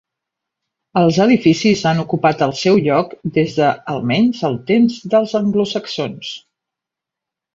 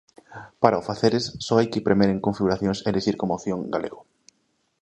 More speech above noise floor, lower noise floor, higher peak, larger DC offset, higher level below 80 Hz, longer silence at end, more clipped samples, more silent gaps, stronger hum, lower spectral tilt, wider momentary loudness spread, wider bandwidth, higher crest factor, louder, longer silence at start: first, 69 dB vs 48 dB; first, -84 dBFS vs -70 dBFS; about the same, -2 dBFS vs 0 dBFS; neither; about the same, -56 dBFS vs -52 dBFS; first, 1.15 s vs 0.8 s; neither; neither; neither; about the same, -6 dB/octave vs -6 dB/octave; about the same, 10 LU vs 9 LU; second, 7.6 kHz vs 8.8 kHz; second, 16 dB vs 24 dB; first, -16 LUFS vs -23 LUFS; first, 0.95 s vs 0.3 s